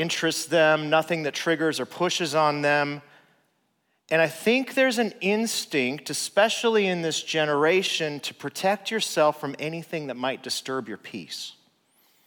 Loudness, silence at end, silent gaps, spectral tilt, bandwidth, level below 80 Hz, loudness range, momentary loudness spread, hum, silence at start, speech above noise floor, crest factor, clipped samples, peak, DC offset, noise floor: -24 LUFS; 0.75 s; none; -3.5 dB/octave; over 20 kHz; -80 dBFS; 4 LU; 11 LU; none; 0 s; 47 dB; 18 dB; under 0.1%; -8 dBFS; under 0.1%; -72 dBFS